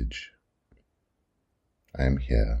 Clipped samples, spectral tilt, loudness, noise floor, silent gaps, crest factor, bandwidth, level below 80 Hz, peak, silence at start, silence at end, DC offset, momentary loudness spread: under 0.1%; -7.5 dB/octave; -28 LUFS; -76 dBFS; none; 20 dB; 7.6 kHz; -32 dBFS; -10 dBFS; 0 s; 0 s; under 0.1%; 19 LU